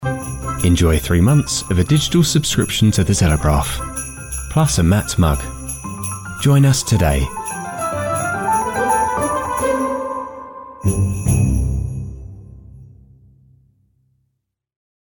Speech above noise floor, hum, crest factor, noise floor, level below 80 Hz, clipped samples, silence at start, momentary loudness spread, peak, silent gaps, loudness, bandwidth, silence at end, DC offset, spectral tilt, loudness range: 59 dB; none; 14 dB; -73 dBFS; -28 dBFS; under 0.1%; 0 s; 12 LU; -4 dBFS; none; -17 LUFS; 17.5 kHz; 2.2 s; under 0.1%; -5 dB/octave; 7 LU